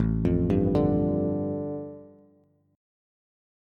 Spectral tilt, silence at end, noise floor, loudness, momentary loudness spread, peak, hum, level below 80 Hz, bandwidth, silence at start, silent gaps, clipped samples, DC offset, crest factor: -11 dB/octave; 1.65 s; -63 dBFS; -26 LUFS; 14 LU; -12 dBFS; none; -42 dBFS; 5.6 kHz; 0 s; none; under 0.1%; under 0.1%; 16 dB